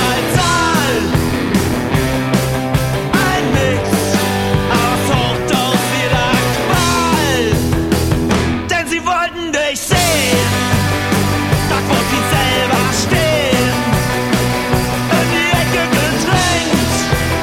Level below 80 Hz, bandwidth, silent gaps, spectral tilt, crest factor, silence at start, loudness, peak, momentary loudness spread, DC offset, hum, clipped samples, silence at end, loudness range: -28 dBFS; 16.5 kHz; none; -4.5 dB/octave; 14 dB; 0 s; -14 LUFS; 0 dBFS; 3 LU; under 0.1%; none; under 0.1%; 0 s; 1 LU